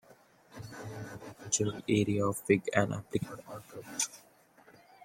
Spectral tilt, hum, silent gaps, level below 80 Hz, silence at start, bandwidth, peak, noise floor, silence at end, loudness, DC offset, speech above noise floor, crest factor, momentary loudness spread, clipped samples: -4.5 dB/octave; none; none; -66 dBFS; 0.1 s; 16.5 kHz; -10 dBFS; -61 dBFS; 0 s; -32 LUFS; under 0.1%; 29 dB; 24 dB; 18 LU; under 0.1%